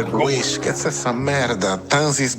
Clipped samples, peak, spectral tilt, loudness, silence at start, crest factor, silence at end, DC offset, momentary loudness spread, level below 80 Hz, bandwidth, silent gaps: under 0.1%; -4 dBFS; -3.5 dB/octave; -20 LUFS; 0 s; 16 dB; 0 s; under 0.1%; 4 LU; -54 dBFS; 16.5 kHz; none